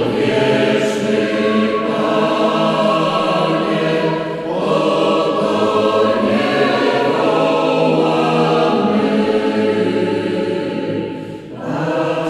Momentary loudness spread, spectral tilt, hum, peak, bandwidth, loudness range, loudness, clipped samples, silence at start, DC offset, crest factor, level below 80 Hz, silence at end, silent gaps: 6 LU; -6 dB/octave; none; -2 dBFS; 12.5 kHz; 2 LU; -16 LUFS; under 0.1%; 0 s; under 0.1%; 12 dB; -54 dBFS; 0 s; none